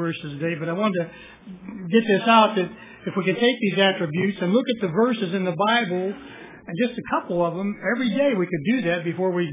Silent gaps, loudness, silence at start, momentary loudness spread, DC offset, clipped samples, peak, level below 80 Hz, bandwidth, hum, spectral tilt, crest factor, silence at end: none; -22 LUFS; 0 s; 15 LU; under 0.1%; under 0.1%; -4 dBFS; -64 dBFS; 3.9 kHz; none; -10 dB/octave; 18 dB; 0 s